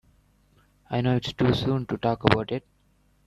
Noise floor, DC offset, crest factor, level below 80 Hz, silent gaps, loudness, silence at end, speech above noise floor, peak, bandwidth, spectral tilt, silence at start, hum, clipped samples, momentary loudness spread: -64 dBFS; under 0.1%; 24 dB; -50 dBFS; none; -25 LUFS; 0.65 s; 40 dB; -4 dBFS; 10.5 kHz; -7.5 dB/octave; 0.9 s; 50 Hz at -50 dBFS; under 0.1%; 9 LU